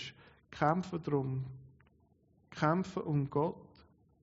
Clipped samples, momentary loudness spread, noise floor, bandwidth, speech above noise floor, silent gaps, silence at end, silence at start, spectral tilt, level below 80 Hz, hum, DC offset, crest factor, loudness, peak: under 0.1%; 20 LU; -69 dBFS; 7.6 kHz; 36 dB; none; 0.55 s; 0 s; -6.5 dB/octave; -68 dBFS; none; under 0.1%; 22 dB; -34 LUFS; -14 dBFS